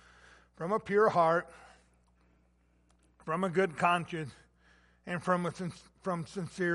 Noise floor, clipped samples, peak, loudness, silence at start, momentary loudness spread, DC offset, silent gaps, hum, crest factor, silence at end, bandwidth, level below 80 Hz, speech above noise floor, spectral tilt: -69 dBFS; under 0.1%; -12 dBFS; -32 LUFS; 0.6 s; 15 LU; under 0.1%; none; 60 Hz at -60 dBFS; 22 dB; 0 s; 11.5 kHz; -68 dBFS; 37 dB; -6 dB/octave